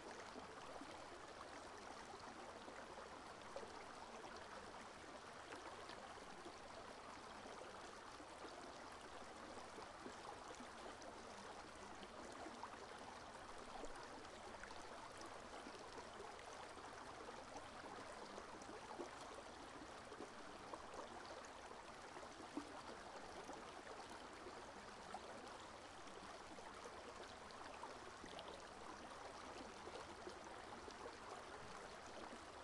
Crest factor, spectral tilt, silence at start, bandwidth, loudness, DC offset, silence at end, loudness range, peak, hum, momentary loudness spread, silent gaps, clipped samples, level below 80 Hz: 20 dB; -3 dB/octave; 0 s; 12 kHz; -55 LUFS; under 0.1%; 0 s; 1 LU; -36 dBFS; none; 2 LU; none; under 0.1%; -74 dBFS